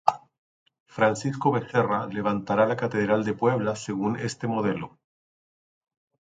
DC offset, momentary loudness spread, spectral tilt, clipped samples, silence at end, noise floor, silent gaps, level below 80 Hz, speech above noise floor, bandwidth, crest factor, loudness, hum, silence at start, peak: under 0.1%; 6 LU; -6.5 dB/octave; under 0.1%; 1.4 s; under -90 dBFS; 0.38-0.66 s, 0.80-0.86 s; -64 dBFS; over 65 dB; 9.4 kHz; 24 dB; -26 LUFS; none; 0.05 s; -2 dBFS